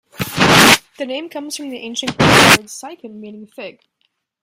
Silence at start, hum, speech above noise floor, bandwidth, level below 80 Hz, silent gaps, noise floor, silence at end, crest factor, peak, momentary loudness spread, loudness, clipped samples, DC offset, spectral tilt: 0.2 s; none; 51 dB; over 20 kHz; -44 dBFS; none; -68 dBFS; 0.75 s; 16 dB; 0 dBFS; 25 LU; -11 LUFS; under 0.1%; under 0.1%; -3 dB/octave